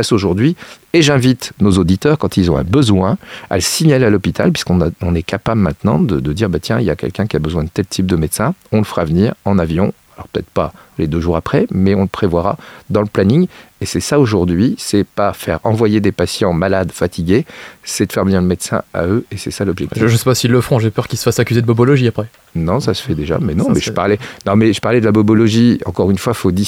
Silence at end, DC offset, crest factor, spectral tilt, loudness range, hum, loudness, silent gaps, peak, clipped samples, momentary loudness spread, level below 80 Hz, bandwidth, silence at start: 0 s; under 0.1%; 14 dB; -6 dB/octave; 3 LU; none; -15 LUFS; none; 0 dBFS; under 0.1%; 7 LU; -36 dBFS; 16.5 kHz; 0 s